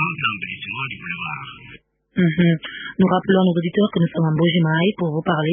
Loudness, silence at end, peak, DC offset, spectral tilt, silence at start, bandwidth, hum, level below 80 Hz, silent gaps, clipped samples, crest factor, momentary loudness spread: -20 LUFS; 0 s; -4 dBFS; under 0.1%; -12 dB/octave; 0 s; 3.7 kHz; none; -56 dBFS; none; under 0.1%; 16 dB; 12 LU